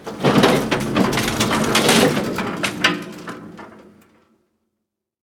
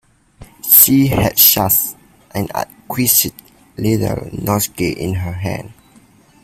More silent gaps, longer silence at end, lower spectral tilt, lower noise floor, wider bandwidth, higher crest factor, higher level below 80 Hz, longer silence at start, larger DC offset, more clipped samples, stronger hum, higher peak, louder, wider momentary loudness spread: neither; first, 1.5 s vs 0.7 s; about the same, -4 dB/octave vs -4 dB/octave; first, -79 dBFS vs -48 dBFS; about the same, 19.5 kHz vs 18 kHz; about the same, 20 dB vs 16 dB; about the same, -46 dBFS vs -42 dBFS; second, 0 s vs 0.4 s; neither; second, under 0.1% vs 0.1%; neither; about the same, 0 dBFS vs 0 dBFS; second, -17 LUFS vs -13 LUFS; first, 19 LU vs 16 LU